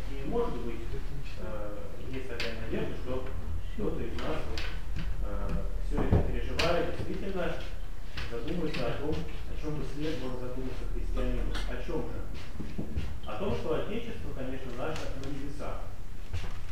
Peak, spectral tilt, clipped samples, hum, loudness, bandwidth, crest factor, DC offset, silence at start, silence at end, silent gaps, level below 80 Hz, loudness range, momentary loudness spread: -10 dBFS; -6.5 dB/octave; under 0.1%; none; -36 LUFS; 15 kHz; 22 dB; 3%; 0 s; 0 s; none; -36 dBFS; 5 LU; 9 LU